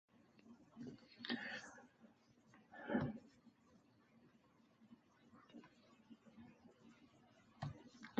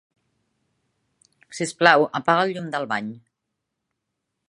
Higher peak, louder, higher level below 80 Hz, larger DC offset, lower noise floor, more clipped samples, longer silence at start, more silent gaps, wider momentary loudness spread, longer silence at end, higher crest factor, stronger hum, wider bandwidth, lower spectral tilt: second, -28 dBFS vs 0 dBFS; second, -49 LUFS vs -21 LUFS; about the same, -78 dBFS vs -76 dBFS; neither; second, -73 dBFS vs -80 dBFS; neither; second, 0.15 s vs 1.5 s; neither; first, 24 LU vs 15 LU; second, 0 s vs 1.3 s; about the same, 26 dB vs 24 dB; neither; second, 7.6 kHz vs 11.5 kHz; about the same, -4 dB/octave vs -4 dB/octave